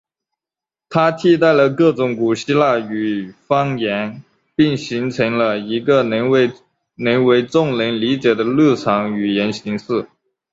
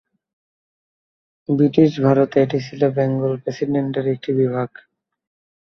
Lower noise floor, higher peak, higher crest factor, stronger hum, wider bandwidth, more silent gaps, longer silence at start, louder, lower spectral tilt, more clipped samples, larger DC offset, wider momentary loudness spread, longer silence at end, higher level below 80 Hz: about the same, -89 dBFS vs under -90 dBFS; about the same, -2 dBFS vs 0 dBFS; about the same, 16 dB vs 20 dB; neither; first, 7.8 kHz vs 6.4 kHz; neither; second, 0.9 s vs 1.5 s; about the same, -17 LUFS vs -19 LUFS; second, -6.5 dB/octave vs -8.5 dB/octave; neither; neither; about the same, 9 LU vs 9 LU; second, 0.5 s vs 0.95 s; about the same, -58 dBFS vs -62 dBFS